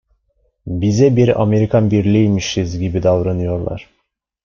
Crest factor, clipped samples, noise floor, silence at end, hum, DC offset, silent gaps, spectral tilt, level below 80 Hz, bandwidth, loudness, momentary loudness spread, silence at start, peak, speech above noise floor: 14 dB; under 0.1%; -69 dBFS; 0.6 s; none; under 0.1%; none; -7 dB/octave; -42 dBFS; 7.2 kHz; -15 LUFS; 12 LU; 0.65 s; -2 dBFS; 55 dB